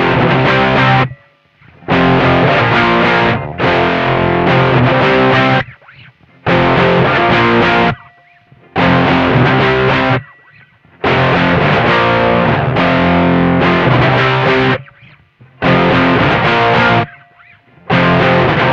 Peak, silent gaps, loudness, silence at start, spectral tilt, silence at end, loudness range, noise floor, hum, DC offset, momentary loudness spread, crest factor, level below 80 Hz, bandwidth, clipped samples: 0 dBFS; none; -11 LUFS; 0 s; -7.5 dB/octave; 0 s; 2 LU; -47 dBFS; none; under 0.1%; 5 LU; 12 dB; -36 dBFS; 7.2 kHz; under 0.1%